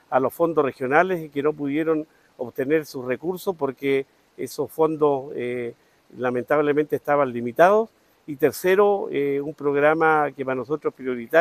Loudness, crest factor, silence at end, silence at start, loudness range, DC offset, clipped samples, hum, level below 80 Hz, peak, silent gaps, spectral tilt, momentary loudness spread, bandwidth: -23 LUFS; 22 dB; 0 s; 0.1 s; 5 LU; under 0.1%; under 0.1%; none; -66 dBFS; 0 dBFS; none; -6 dB/octave; 12 LU; 14.5 kHz